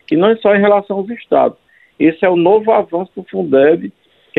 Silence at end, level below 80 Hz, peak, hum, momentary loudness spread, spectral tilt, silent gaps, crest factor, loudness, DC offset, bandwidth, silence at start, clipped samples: 0.5 s; -58 dBFS; 0 dBFS; none; 11 LU; -9.5 dB/octave; none; 14 dB; -13 LUFS; under 0.1%; 4.9 kHz; 0.1 s; under 0.1%